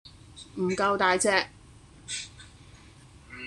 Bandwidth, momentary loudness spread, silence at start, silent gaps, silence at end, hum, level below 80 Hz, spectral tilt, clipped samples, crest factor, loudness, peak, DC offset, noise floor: 12.5 kHz; 24 LU; 0.05 s; none; 0 s; none; -58 dBFS; -3 dB/octave; under 0.1%; 24 dB; -27 LUFS; -6 dBFS; under 0.1%; -52 dBFS